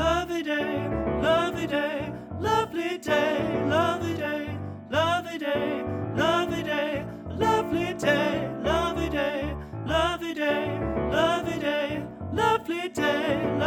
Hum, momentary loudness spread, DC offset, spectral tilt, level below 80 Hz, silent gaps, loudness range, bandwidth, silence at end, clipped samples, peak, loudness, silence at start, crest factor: none; 7 LU; under 0.1%; -5.5 dB/octave; -44 dBFS; none; 1 LU; 19 kHz; 0 s; under 0.1%; -10 dBFS; -27 LUFS; 0 s; 18 dB